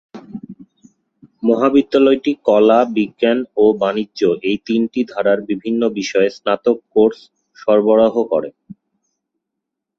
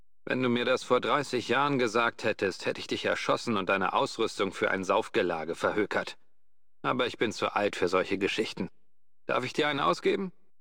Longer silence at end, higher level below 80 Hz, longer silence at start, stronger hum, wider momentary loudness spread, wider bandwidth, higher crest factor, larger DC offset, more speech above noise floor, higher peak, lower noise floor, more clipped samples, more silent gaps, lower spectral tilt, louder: first, 1.25 s vs 0.3 s; first, -58 dBFS vs -70 dBFS; about the same, 0.15 s vs 0.25 s; neither; about the same, 8 LU vs 7 LU; second, 7.2 kHz vs 16.5 kHz; about the same, 16 dB vs 18 dB; second, under 0.1% vs 0.3%; first, 65 dB vs 57 dB; first, -2 dBFS vs -12 dBFS; second, -80 dBFS vs -86 dBFS; neither; neither; first, -6 dB/octave vs -4.5 dB/octave; first, -16 LUFS vs -29 LUFS